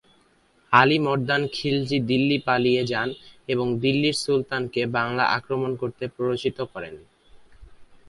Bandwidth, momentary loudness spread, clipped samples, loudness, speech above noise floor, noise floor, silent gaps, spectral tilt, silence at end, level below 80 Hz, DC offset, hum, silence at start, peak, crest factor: 11.5 kHz; 11 LU; under 0.1%; -23 LUFS; 38 dB; -61 dBFS; none; -5.5 dB/octave; 0.15 s; -58 dBFS; under 0.1%; none; 0.7 s; 0 dBFS; 24 dB